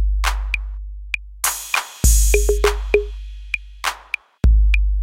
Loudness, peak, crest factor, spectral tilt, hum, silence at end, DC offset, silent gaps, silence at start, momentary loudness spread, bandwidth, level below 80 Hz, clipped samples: -20 LUFS; -2 dBFS; 18 dB; -3.5 dB/octave; none; 0 s; under 0.1%; none; 0 s; 12 LU; 16.5 kHz; -20 dBFS; under 0.1%